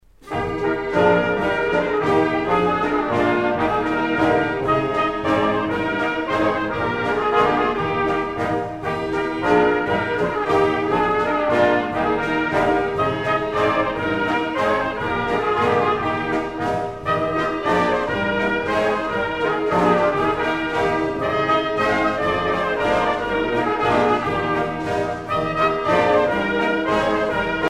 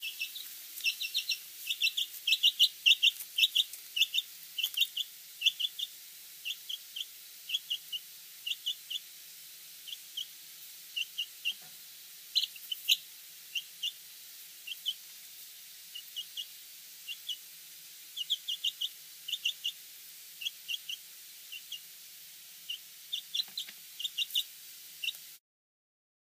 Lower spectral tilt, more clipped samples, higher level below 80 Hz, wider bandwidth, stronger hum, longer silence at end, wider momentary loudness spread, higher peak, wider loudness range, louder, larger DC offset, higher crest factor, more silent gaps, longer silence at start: first, -6 dB/octave vs 4.5 dB/octave; neither; first, -44 dBFS vs under -90 dBFS; second, 12.5 kHz vs 15.5 kHz; neither; second, 0 s vs 1 s; second, 5 LU vs 19 LU; first, -4 dBFS vs -12 dBFS; second, 2 LU vs 14 LU; first, -20 LUFS vs -33 LUFS; neither; second, 16 dB vs 26 dB; neither; first, 0.25 s vs 0 s